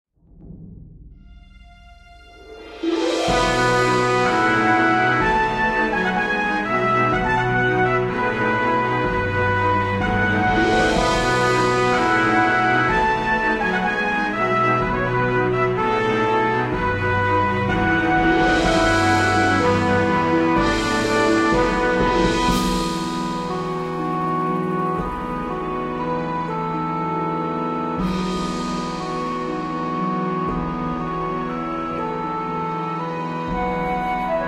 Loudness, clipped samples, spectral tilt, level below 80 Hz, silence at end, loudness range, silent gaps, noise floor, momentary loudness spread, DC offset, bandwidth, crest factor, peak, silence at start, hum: -20 LUFS; under 0.1%; -5.5 dB/octave; -38 dBFS; 0 s; 7 LU; none; -45 dBFS; 8 LU; under 0.1%; 15 kHz; 14 dB; -6 dBFS; 0.35 s; none